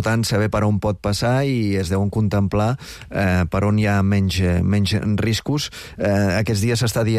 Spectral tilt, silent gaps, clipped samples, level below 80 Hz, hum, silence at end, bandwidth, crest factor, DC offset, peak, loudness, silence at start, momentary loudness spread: -6 dB/octave; none; under 0.1%; -38 dBFS; none; 0 s; 15 kHz; 10 dB; under 0.1%; -10 dBFS; -20 LUFS; 0 s; 5 LU